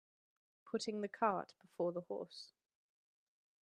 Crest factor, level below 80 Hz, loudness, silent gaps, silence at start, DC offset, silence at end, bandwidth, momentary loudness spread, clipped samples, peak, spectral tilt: 22 dB; under -90 dBFS; -42 LUFS; none; 0.65 s; under 0.1%; 1.15 s; 11.5 kHz; 17 LU; under 0.1%; -22 dBFS; -5 dB/octave